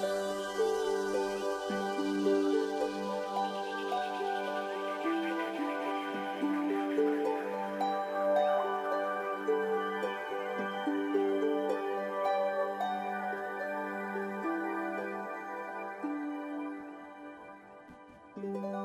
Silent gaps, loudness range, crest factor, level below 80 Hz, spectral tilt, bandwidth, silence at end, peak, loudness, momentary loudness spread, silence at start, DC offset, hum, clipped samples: none; 6 LU; 16 dB; -74 dBFS; -5 dB/octave; 15.5 kHz; 0 s; -18 dBFS; -34 LUFS; 10 LU; 0 s; under 0.1%; none; under 0.1%